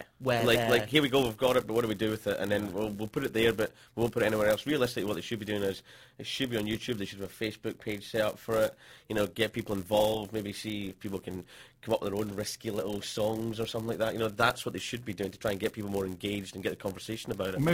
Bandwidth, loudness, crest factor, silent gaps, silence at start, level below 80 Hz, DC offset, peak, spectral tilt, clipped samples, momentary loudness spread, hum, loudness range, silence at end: 16.5 kHz; -31 LUFS; 22 dB; none; 0 s; -58 dBFS; under 0.1%; -10 dBFS; -5 dB/octave; under 0.1%; 10 LU; none; 6 LU; 0 s